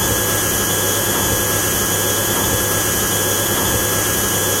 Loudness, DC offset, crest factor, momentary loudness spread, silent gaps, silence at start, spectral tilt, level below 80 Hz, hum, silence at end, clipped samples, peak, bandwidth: -15 LUFS; under 0.1%; 14 dB; 0 LU; none; 0 s; -2.5 dB/octave; -36 dBFS; none; 0 s; under 0.1%; -4 dBFS; 16 kHz